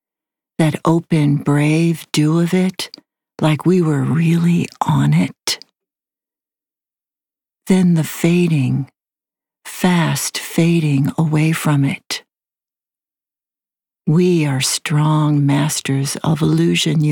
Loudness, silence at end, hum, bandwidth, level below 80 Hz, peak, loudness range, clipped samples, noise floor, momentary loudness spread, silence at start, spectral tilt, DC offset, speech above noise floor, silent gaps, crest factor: -16 LUFS; 0 s; none; 19 kHz; -56 dBFS; -4 dBFS; 4 LU; under 0.1%; under -90 dBFS; 7 LU; 0.6 s; -5.5 dB/octave; under 0.1%; over 75 dB; none; 14 dB